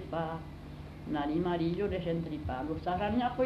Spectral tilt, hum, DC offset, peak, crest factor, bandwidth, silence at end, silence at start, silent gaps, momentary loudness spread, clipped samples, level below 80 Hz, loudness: -8.5 dB/octave; 50 Hz at -55 dBFS; under 0.1%; -18 dBFS; 14 dB; 12.5 kHz; 0 s; 0 s; none; 14 LU; under 0.1%; -50 dBFS; -34 LUFS